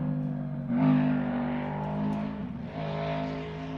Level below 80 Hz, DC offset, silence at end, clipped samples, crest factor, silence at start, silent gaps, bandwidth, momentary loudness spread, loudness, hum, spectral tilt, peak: -52 dBFS; under 0.1%; 0 s; under 0.1%; 16 dB; 0 s; none; 6 kHz; 11 LU; -30 LUFS; none; -9.5 dB/octave; -12 dBFS